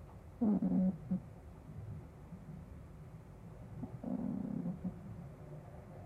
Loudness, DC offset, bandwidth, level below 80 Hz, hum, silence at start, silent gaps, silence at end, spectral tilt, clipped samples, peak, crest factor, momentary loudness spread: -40 LUFS; under 0.1%; 3.2 kHz; -60 dBFS; none; 0 s; none; 0 s; -10.5 dB/octave; under 0.1%; -24 dBFS; 16 dB; 20 LU